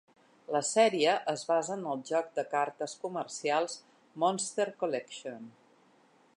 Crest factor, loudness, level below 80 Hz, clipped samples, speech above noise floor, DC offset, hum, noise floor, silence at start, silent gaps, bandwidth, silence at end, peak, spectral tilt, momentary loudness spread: 20 dB; -31 LUFS; -88 dBFS; under 0.1%; 33 dB; under 0.1%; none; -65 dBFS; 0.5 s; none; 11.5 kHz; 0.85 s; -12 dBFS; -3 dB/octave; 16 LU